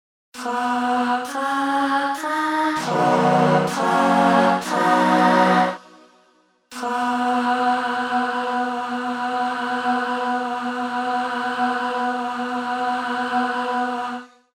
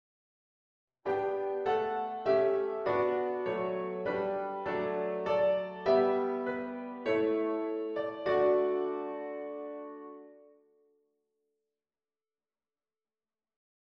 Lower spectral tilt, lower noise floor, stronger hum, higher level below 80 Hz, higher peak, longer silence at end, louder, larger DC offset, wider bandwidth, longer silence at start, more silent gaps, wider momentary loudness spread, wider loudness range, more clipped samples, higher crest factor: second, -5 dB/octave vs -7.5 dB/octave; second, -60 dBFS vs under -90 dBFS; neither; first, -66 dBFS vs -72 dBFS; first, -4 dBFS vs -16 dBFS; second, 0.3 s vs 3.45 s; first, -21 LUFS vs -32 LUFS; neither; first, 16 kHz vs 6.2 kHz; second, 0.35 s vs 1.05 s; neither; second, 9 LU vs 12 LU; second, 6 LU vs 10 LU; neither; about the same, 18 dB vs 18 dB